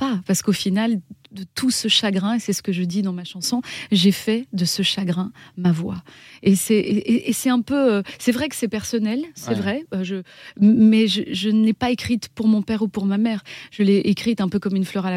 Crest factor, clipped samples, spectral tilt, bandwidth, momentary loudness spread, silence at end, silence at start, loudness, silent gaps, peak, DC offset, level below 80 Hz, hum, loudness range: 16 dB; under 0.1%; -5 dB/octave; 15.5 kHz; 9 LU; 0 s; 0 s; -20 LUFS; none; -6 dBFS; under 0.1%; -58 dBFS; none; 3 LU